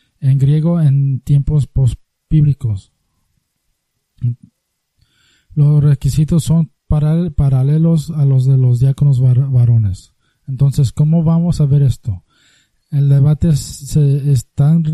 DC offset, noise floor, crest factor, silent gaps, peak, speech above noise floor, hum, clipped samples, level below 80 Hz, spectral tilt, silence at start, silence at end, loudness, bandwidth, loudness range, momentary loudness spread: under 0.1%; -68 dBFS; 12 dB; none; -2 dBFS; 56 dB; none; under 0.1%; -32 dBFS; -8.5 dB/octave; 0.2 s; 0 s; -14 LUFS; 12 kHz; 7 LU; 11 LU